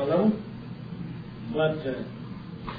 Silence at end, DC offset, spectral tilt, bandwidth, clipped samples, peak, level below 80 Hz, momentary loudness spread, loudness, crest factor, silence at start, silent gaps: 0 s; under 0.1%; -10 dB/octave; 5 kHz; under 0.1%; -12 dBFS; -54 dBFS; 15 LU; -30 LUFS; 16 dB; 0 s; none